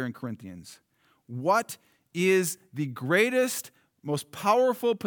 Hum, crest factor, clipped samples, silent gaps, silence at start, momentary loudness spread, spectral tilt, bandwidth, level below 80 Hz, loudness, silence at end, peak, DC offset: none; 20 dB; under 0.1%; none; 0 s; 19 LU; -4.5 dB/octave; over 20 kHz; -80 dBFS; -26 LUFS; 0 s; -8 dBFS; under 0.1%